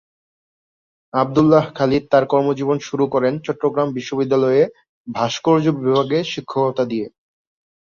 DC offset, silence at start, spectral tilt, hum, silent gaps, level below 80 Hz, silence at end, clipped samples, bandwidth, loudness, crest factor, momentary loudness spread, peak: under 0.1%; 1.15 s; -6.5 dB/octave; none; 4.89-5.05 s; -56 dBFS; 0.75 s; under 0.1%; 7.2 kHz; -18 LUFS; 18 dB; 8 LU; -2 dBFS